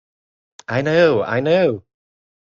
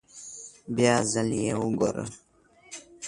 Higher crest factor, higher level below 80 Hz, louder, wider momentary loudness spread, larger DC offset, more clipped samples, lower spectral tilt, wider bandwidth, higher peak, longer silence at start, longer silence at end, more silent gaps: about the same, 18 dB vs 20 dB; about the same, -58 dBFS vs -58 dBFS; first, -17 LUFS vs -26 LUFS; second, 14 LU vs 20 LU; neither; neither; first, -7 dB/octave vs -4.5 dB/octave; second, 7.4 kHz vs 11.5 kHz; first, -2 dBFS vs -8 dBFS; first, 0.7 s vs 0.15 s; first, 0.7 s vs 0 s; neither